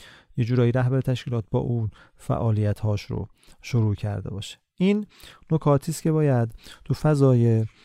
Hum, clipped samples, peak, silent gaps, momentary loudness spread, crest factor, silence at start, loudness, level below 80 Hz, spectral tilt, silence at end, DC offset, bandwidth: none; under 0.1%; -6 dBFS; none; 14 LU; 18 dB; 0 s; -24 LUFS; -48 dBFS; -8 dB/octave; 0.15 s; under 0.1%; 14 kHz